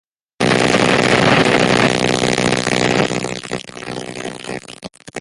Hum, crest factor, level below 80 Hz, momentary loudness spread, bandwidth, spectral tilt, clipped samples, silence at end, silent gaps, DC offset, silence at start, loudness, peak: none; 16 dB; -44 dBFS; 16 LU; 11.5 kHz; -4 dB/octave; under 0.1%; 0 s; none; under 0.1%; 0.4 s; -15 LUFS; 0 dBFS